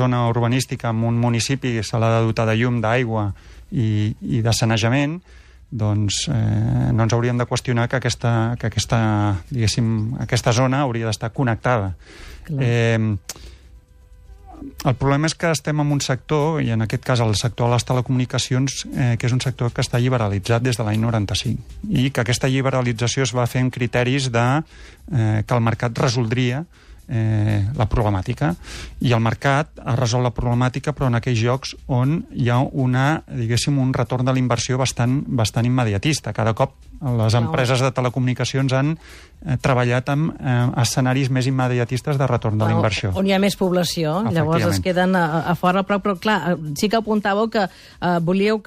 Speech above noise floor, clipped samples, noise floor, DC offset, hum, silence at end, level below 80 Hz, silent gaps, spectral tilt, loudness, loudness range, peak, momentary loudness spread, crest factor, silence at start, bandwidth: 27 dB; under 0.1%; -47 dBFS; under 0.1%; none; 0.05 s; -42 dBFS; none; -5.5 dB/octave; -20 LUFS; 2 LU; -6 dBFS; 5 LU; 14 dB; 0 s; 14.5 kHz